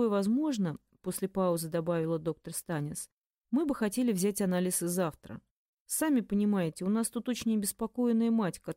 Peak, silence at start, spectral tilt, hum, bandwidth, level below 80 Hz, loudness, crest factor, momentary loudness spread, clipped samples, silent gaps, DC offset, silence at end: -18 dBFS; 0 s; -5.5 dB/octave; none; 16 kHz; -64 dBFS; -31 LUFS; 14 dB; 10 LU; under 0.1%; 3.12-3.30 s, 3.37-3.41 s, 5.51-5.86 s; under 0.1%; 0.05 s